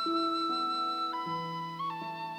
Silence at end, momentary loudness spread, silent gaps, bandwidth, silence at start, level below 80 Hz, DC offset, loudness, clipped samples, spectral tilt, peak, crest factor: 0 s; 7 LU; none; 20 kHz; 0 s; -78 dBFS; under 0.1%; -33 LUFS; under 0.1%; -5 dB/octave; -22 dBFS; 12 dB